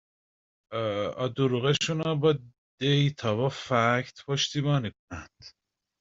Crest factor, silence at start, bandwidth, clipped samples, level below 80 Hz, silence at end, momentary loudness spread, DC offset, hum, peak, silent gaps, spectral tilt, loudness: 20 dB; 0.7 s; 7.8 kHz; under 0.1%; -62 dBFS; 0.5 s; 10 LU; under 0.1%; none; -8 dBFS; 2.58-2.78 s, 4.99-5.08 s; -5.5 dB/octave; -27 LUFS